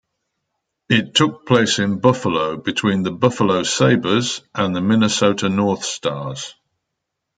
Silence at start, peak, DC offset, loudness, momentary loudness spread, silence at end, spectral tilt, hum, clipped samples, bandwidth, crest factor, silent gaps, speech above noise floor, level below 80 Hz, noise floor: 0.9 s; -2 dBFS; under 0.1%; -18 LUFS; 8 LU; 0.85 s; -4.5 dB/octave; none; under 0.1%; 9.4 kHz; 18 dB; none; 61 dB; -58 dBFS; -78 dBFS